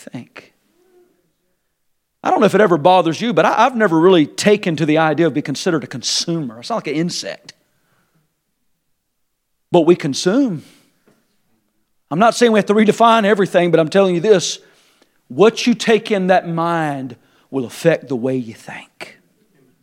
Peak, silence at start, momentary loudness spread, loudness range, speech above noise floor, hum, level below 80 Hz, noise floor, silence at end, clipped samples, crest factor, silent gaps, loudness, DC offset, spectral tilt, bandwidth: 0 dBFS; 0.15 s; 17 LU; 8 LU; 55 dB; none; -68 dBFS; -70 dBFS; 0.8 s; under 0.1%; 16 dB; none; -15 LUFS; under 0.1%; -5 dB/octave; 15.5 kHz